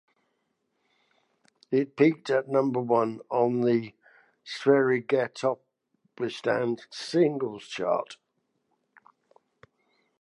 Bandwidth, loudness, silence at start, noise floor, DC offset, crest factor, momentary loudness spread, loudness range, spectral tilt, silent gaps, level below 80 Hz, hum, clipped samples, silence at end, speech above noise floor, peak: 11 kHz; -27 LUFS; 1.7 s; -76 dBFS; under 0.1%; 20 dB; 11 LU; 5 LU; -6.5 dB/octave; none; -80 dBFS; none; under 0.1%; 2.05 s; 51 dB; -8 dBFS